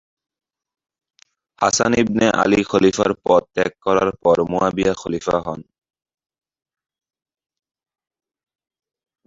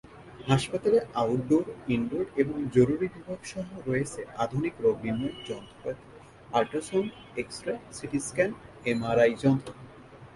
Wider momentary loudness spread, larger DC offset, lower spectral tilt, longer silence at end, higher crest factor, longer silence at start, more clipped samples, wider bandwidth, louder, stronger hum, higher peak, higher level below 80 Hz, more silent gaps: second, 7 LU vs 14 LU; neither; second, -4.5 dB/octave vs -6 dB/octave; first, 3.65 s vs 0.1 s; about the same, 20 dB vs 20 dB; first, 1.6 s vs 0.1 s; neither; second, 8 kHz vs 11.5 kHz; first, -18 LUFS vs -29 LUFS; neither; first, -2 dBFS vs -8 dBFS; first, -50 dBFS vs -58 dBFS; neither